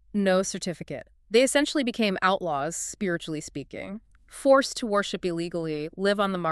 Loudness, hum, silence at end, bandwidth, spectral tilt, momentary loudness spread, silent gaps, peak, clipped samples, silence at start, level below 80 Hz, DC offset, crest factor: -26 LUFS; none; 0 s; 13.5 kHz; -4 dB/octave; 16 LU; none; -8 dBFS; under 0.1%; 0.15 s; -58 dBFS; under 0.1%; 18 dB